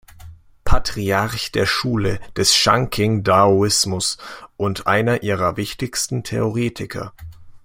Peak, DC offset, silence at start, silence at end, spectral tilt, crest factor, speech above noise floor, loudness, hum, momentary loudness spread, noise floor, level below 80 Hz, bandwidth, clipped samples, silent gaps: 0 dBFS; under 0.1%; 0.25 s; 0.05 s; -4 dB/octave; 18 dB; 22 dB; -19 LUFS; none; 12 LU; -41 dBFS; -32 dBFS; 16.5 kHz; under 0.1%; none